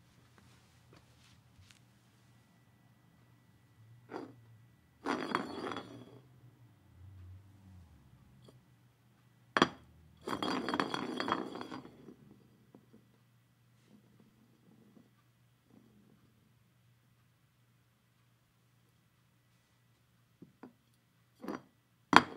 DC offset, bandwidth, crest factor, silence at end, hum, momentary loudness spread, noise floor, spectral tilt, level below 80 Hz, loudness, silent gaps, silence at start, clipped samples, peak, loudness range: under 0.1%; 16 kHz; 42 dB; 0 s; none; 29 LU; -71 dBFS; -4 dB/octave; -78 dBFS; -36 LUFS; none; 1.6 s; under 0.1%; 0 dBFS; 22 LU